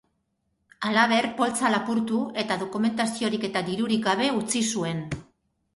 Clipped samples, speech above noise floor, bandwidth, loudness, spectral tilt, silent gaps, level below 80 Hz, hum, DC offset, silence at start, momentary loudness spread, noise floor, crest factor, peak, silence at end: under 0.1%; 50 dB; 11.5 kHz; -25 LUFS; -4 dB/octave; none; -60 dBFS; none; under 0.1%; 0.8 s; 7 LU; -74 dBFS; 18 dB; -8 dBFS; 0.55 s